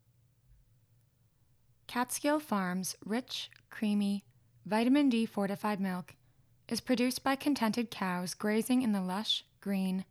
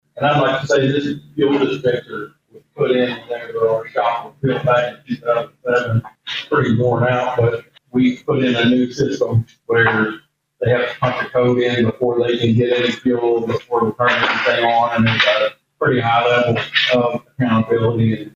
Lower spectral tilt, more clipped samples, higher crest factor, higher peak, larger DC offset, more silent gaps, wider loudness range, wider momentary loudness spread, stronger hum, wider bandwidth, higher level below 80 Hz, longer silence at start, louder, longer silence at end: second, -4.5 dB/octave vs -6.5 dB/octave; neither; about the same, 16 dB vs 14 dB; second, -16 dBFS vs -2 dBFS; neither; neither; about the same, 4 LU vs 4 LU; about the same, 9 LU vs 7 LU; neither; first, 15 kHz vs 7.6 kHz; second, -72 dBFS vs -52 dBFS; first, 1.9 s vs 0.15 s; second, -33 LUFS vs -17 LUFS; about the same, 0.1 s vs 0.05 s